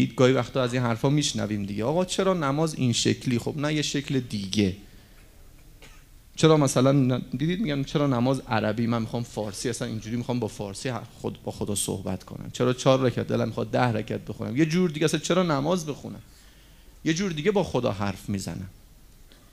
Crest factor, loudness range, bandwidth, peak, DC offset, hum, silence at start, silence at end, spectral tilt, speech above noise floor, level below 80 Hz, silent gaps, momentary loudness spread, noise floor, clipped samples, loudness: 22 dB; 5 LU; 15.5 kHz; -4 dBFS; under 0.1%; none; 0 s; 0.3 s; -5.5 dB/octave; 26 dB; -52 dBFS; none; 12 LU; -52 dBFS; under 0.1%; -26 LUFS